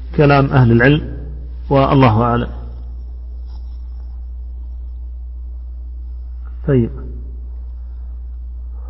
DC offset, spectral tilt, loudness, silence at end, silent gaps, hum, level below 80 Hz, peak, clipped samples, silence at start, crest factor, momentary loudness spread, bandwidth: under 0.1%; -11 dB/octave; -14 LUFS; 0 s; none; none; -26 dBFS; 0 dBFS; under 0.1%; 0 s; 18 dB; 20 LU; 5.8 kHz